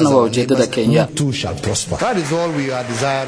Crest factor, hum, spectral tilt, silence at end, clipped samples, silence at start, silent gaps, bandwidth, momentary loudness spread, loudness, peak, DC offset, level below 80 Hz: 16 dB; none; -5 dB/octave; 0 s; under 0.1%; 0 s; none; 11 kHz; 6 LU; -17 LUFS; 0 dBFS; under 0.1%; -44 dBFS